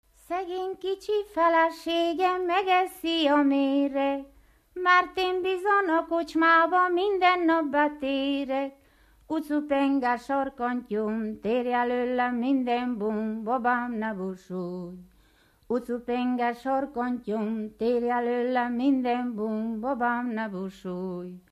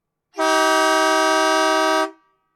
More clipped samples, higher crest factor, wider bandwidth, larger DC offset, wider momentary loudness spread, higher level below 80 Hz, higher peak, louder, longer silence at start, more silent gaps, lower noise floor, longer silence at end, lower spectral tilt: neither; about the same, 18 dB vs 14 dB; second, 14.5 kHz vs 16.5 kHz; neither; first, 11 LU vs 7 LU; first, -62 dBFS vs -74 dBFS; about the same, -8 dBFS vs -6 dBFS; second, -26 LUFS vs -17 LUFS; about the same, 0.3 s vs 0.35 s; neither; first, -61 dBFS vs -39 dBFS; second, 0.1 s vs 0.45 s; first, -5.5 dB/octave vs 0.5 dB/octave